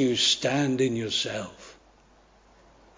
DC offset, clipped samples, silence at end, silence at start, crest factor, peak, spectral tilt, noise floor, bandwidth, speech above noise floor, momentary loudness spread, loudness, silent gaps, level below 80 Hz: under 0.1%; under 0.1%; 1.25 s; 0 s; 18 dB; -10 dBFS; -3.5 dB/octave; -58 dBFS; 7.8 kHz; 32 dB; 12 LU; -25 LUFS; none; -62 dBFS